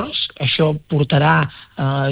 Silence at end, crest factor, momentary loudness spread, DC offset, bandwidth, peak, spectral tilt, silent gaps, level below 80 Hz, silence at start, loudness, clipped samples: 0 s; 16 dB; 8 LU; under 0.1%; 5 kHz; -2 dBFS; -8.5 dB/octave; none; -48 dBFS; 0 s; -18 LUFS; under 0.1%